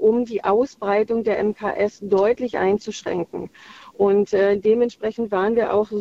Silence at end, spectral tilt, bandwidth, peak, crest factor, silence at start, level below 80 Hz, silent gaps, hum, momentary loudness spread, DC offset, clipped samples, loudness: 0 s; -6 dB/octave; 7.6 kHz; -6 dBFS; 14 dB; 0 s; -56 dBFS; none; none; 9 LU; under 0.1%; under 0.1%; -21 LUFS